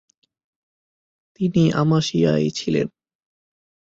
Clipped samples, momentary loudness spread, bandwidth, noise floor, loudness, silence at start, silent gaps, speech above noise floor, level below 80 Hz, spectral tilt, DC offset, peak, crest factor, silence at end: under 0.1%; 7 LU; 7.8 kHz; under -90 dBFS; -20 LUFS; 1.4 s; none; over 71 dB; -56 dBFS; -6.5 dB/octave; under 0.1%; -6 dBFS; 18 dB; 1.1 s